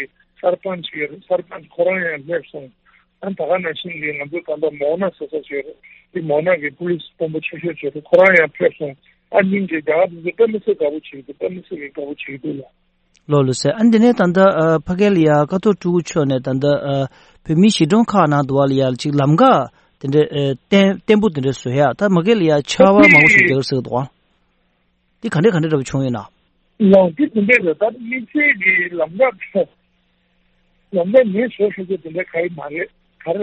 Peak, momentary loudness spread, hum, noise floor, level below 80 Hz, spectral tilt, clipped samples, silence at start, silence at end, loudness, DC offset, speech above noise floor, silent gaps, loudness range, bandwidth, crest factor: 0 dBFS; 15 LU; none; -63 dBFS; -54 dBFS; -6.5 dB/octave; under 0.1%; 0 s; 0 s; -16 LUFS; under 0.1%; 47 dB; none; 10 LU; 8.4 kHz; 16 dB